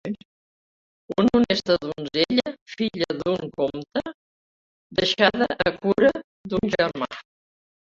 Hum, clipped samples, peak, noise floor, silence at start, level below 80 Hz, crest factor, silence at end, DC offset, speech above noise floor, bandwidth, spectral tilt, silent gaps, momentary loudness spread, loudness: none; under 0.1%; -2 dBFS; under -90 dBFS; 0.05 s; -54 dBFS; 22 dB; 0.7 s; under 0.1%; over 67 dB; 7.8 kHz; -5.5 dB/octave; 0.25-1.08 s, 2.61-2.66 s, 4.14-4.90 s, 6.24-6.44 s; 13 LU; -23 LUFS